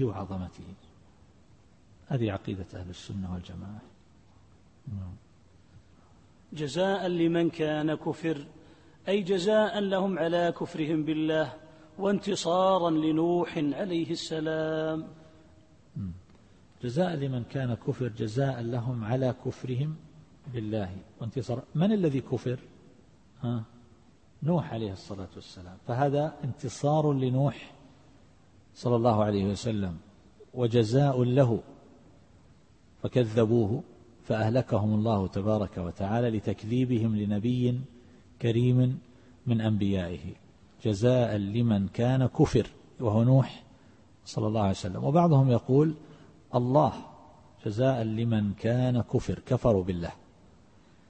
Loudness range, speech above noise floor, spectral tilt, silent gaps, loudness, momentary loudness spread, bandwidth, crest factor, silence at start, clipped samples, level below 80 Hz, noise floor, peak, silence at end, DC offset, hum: 9 LU; 32 dB; -7.5 dB/octave; none; -28 LUFS; 16 LU; 8.8 kHz; 20 dB; 0 s; under 0.1%; -56 dBFS; -59 dBFS; -10 dBFS; 0.95 s; under 0.1%; none